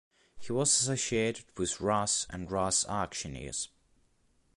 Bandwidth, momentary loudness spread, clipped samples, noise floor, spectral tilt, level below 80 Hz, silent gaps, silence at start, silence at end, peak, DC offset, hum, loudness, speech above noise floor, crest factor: 11.5 kHz; 11 LU; under 0.1%; -69 dBFS; -3 dB/octave; -56 dBFS; none; 0.35 s; 0.9 s; -14 dBFS; under 0.1%; none; -30 LUFS; 38 dB; 18 dB